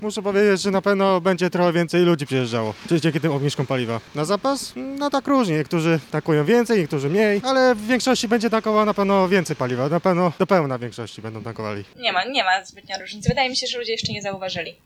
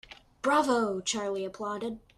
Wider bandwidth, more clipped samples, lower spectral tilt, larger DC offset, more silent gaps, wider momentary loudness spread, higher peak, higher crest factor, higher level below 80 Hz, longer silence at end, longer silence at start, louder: first, 15.5 kHz vs 13.5 kHz; neither; first, -5.5 dB/octave vs -3 dB/octave; neither; neither; about the same, 10 LU vs 10 LU; first, -4 dBFS vs -14 dBFS; about the same, 16 dB vs 18 dB; first, -52 dBFS vs -64 dBFS; about the same, 0.15 s vs 0.2 s; about the same, 0 s vs 0.1 s; first, -21 LUFS vs -30 LUFS